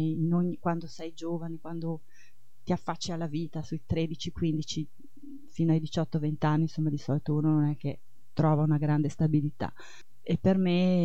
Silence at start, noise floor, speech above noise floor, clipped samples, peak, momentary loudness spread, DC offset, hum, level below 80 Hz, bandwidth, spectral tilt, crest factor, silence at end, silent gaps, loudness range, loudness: 0 s; -64 dBFS; 35 dB; under 0.1%; -12 dBFS; 13 LU; 1%; none; -56 dBFS; 8 kHz; -7.5 dB/octave; 18 dB; 0 s; none; 6 LU; -30 LUFS